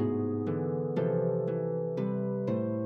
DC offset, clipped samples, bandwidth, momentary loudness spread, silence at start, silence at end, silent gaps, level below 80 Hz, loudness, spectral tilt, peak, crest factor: under 0.1%; under 0.1%; 5.6 kHz; 3 LU; 0 s; 0 s; none; -74 dBFS; -31 LUFS; -11 dB/octave; -18 dBFS; 12 dB